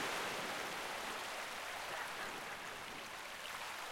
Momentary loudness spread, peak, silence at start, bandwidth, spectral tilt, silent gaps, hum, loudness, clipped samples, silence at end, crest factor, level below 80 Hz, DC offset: 6 LU; -28 dBFS; 0 s; 16.5 kHz; -1.5 dB/octave; none; none; -43 LUFS; under 0.1%; 0 s; 16 dB; -72 dBFS; under 0.1%